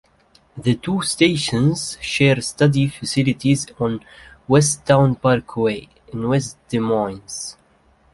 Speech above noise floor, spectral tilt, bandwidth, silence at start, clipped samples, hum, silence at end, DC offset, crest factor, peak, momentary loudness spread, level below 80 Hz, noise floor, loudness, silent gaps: 38 dB; -5 dB/octave; 11.5 kHz; 0.55 s; under 0.1%; none; 0.6 s; under 0.1%; 18 dB; -2 dBFS; 13 LU; -50 dBFS; -56 dBFS; -19 LUFS; none